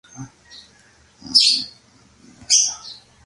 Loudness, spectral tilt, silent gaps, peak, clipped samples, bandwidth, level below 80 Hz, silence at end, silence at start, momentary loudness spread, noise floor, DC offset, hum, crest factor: -15 LUFS; 1.5 dB/octave; none; 0 dBFS; under 0.1%; 11.5 kHz; -60 dBFS; 0.35 s; 0.15 s; 26 LU; -53 dBFS; under 0.1%; none; 22 dB